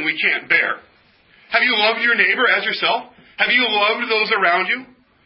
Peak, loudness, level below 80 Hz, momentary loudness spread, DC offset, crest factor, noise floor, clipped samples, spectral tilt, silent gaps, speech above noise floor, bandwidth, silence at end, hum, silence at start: 0 dBFS; -16 LUFS; -70 dBFS; 7 LU; under 0.1%; 18 dB; -53 dBFS; under 0.1%; -7 dB/octave; none; 36 dB; 5.8 kHz; 0.4 s; none; 0 s